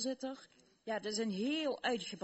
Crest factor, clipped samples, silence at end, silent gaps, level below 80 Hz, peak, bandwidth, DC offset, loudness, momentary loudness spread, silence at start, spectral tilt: 18 dB; under 0.1%; 0 s; none; -80 dBFS; -22 dBFS; 8.2 kHz; under 0.1%; -38 LUFS; 12 LU; 0 s; -3.5 dB/octave